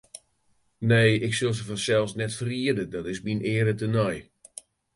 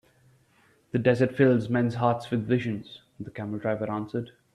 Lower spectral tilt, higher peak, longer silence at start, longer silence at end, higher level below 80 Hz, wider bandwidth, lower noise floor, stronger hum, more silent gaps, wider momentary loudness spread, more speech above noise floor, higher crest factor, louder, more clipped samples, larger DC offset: second, -5.5 dB/octave vs -8.5 dB/octave; about the same, -6 dBFS vs -8 dBFS; second, 0.15 s vs 0.95 s; first, 0.75 s vs 0.25 s; first, -56 dBFS vs -64 dBFS; about the same, 11.5 kHz vs 11 kHz; first, -68 dBFS vs -63 dBFS; neither; neither; first, 22 LU vs 15 LU; first, 43 dB vs 37 dB; about the same, 20 dB vs 20 dB; about the same, -25 LUFS vs -27 LUFS; neither; neither